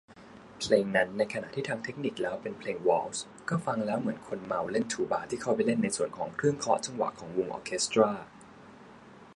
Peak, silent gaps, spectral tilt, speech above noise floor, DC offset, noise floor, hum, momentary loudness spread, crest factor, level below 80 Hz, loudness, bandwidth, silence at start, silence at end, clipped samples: -8 dBFS; none; -4.5 dB/octave; 22 dB; under 0.1%; -52 dBFS; none; 10 LU; 22 dB; -66 dBFS; -31 LUFS; 11.5 kHz; 0.1 s; 0 s; under 0.1%